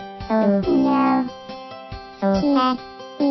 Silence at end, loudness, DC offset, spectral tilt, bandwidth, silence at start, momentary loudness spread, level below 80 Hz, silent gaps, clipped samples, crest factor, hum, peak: 0 s; -20 LUFS; under 0.1%; -7.5 dB/octave; 6 kHz; 0 s; 18 LU; -46 dBFS; none; under 0.1%; 14 dB; none; -6 dBFS